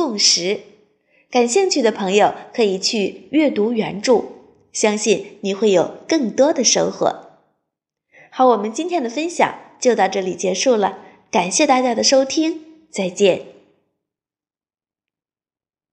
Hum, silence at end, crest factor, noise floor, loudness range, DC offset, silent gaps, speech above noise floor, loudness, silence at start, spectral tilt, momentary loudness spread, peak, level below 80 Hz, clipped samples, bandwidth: none; 2.4 s; 18 dB; under -90 dBFS; 3 LU; under 0.1%; none; over 73 dB; -18 LUFS; 0 s; -3 dB/octave; 9 LU; -2 dBFS; -68 dBFS; under 0.1%; 10.5 kHz